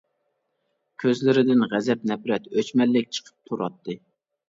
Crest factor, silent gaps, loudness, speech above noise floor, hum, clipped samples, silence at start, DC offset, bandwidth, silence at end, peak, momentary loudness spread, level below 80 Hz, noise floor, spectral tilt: 16 dB; none; -23 LUFS; 52 dB; none; under 0.1%; 1 s; under 0.1%; 7.8 kHz; 0.55 s; -8 dBFS; 15 LU; -72 dBFS; -75 dBFS; -6 dB/octave